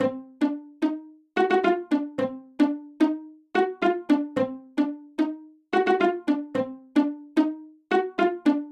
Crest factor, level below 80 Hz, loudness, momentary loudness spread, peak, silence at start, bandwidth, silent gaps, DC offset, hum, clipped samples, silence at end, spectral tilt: 16 dB; -74 dBFS; -26 LUFS; 7 LU; -10 dBFS; 0 s; 9.2 kHz; none; under 0.1%; none; under 0.1%; 0 s; -6.5 dB/octave